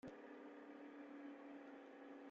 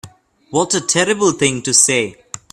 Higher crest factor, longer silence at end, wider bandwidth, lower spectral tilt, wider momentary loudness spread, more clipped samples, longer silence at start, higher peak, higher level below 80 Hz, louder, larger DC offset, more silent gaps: second, 12 dB vs 18 dB; second, 0 s vs 0.15 s; second, 7.2 kHz vs 16 kHz; first, -4.5 dB/octave vs -2.5 dB/octave; second, 2 LU vs 11 LU; neither; about the same, 0.05 s vs 0.05 s; second, -44 dBFS vs 0 dBFS; second, under -90 dBFS vs -56 dBFS; second, -58 LUFS vs -14 LUFS; neither; neither